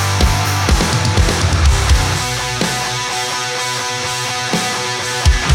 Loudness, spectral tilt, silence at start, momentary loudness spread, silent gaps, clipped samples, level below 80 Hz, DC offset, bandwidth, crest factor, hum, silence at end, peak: -16 LUFS; -3.5 dB/octave; 0 s; 4 LU; none; under 0.1%; -20 dBFS; under 0.1%; 17 kHz; 14 dB; none; 0 s; -2 dBFS